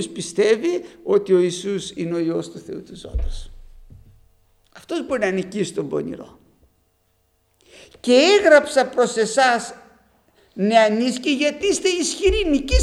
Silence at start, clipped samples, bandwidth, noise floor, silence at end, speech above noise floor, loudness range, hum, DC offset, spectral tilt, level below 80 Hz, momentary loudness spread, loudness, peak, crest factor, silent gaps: 0 s; under 0.1%; 13 kHz; -65 dBFS; 0 s; 46 dB; 11 LU; none; under 0.1%; -4 dB/octave; -34 dBFS; 18 LU; -19 LUFS; 0 dBFS; 20 dB; none